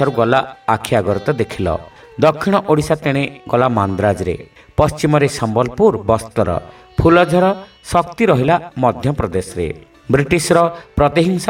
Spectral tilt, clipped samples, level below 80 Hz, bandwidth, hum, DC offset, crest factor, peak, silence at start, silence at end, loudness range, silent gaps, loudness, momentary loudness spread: -6 dB/octave; under 0.1%; -36 dBFS; 16.5 kHz; none; under 0.1%; 16 dB; 0 dBFS; 0 s; 0 s; 2 LU; none; -16 LUFS; 10 LU